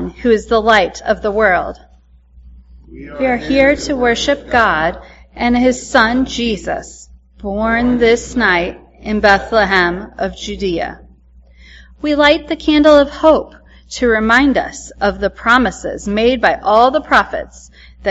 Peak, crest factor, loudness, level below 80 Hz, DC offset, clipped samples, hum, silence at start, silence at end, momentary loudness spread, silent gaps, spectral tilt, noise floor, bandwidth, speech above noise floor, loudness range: 0 dBFS; 14 dB; -14 LUFS; -36 dBFS; under 0.1%; under 0.1%; none; 0 s; 0 s; 13 LU; none; -4.5 dB/octave; -46 dBFS; 8.2 kHz; 33 dB; 4 LU